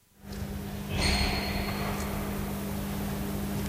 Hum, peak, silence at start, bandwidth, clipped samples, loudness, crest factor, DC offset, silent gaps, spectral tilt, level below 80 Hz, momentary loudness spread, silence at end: none; -14 dBFS; 0.2 s; 16 kHz; under 0.1%; -32 LUFS; 18 dB; under 0.1%; none; -4.5 dB/octave; -38 dBFS; 10 LU; 0 s